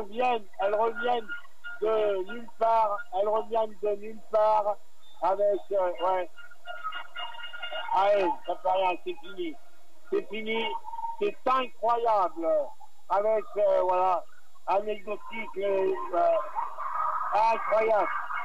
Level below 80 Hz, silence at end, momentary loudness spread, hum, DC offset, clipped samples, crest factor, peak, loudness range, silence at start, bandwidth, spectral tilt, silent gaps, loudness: -72 dBFS; 0 s; 13 LU; none; 2%; under 0.1%; 14 dB; -14 dBFS; 3 LU; 0 s; 12 kHz; -5 dB/octave; none; -28 LUFS